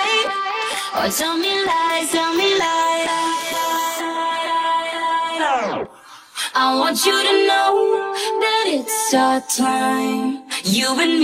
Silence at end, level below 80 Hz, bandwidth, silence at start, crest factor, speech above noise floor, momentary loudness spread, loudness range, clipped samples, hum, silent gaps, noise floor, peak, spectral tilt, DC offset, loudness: 0 s; -60 dBFS; 16.5 kHz; 0 s; 16 dB; 25 dB; 6 LU; 4 LU; under 0.1%; none; none; -42 dBFS; -4 dBFS; -2 dB/octave; under 0.1%; -18 LUFS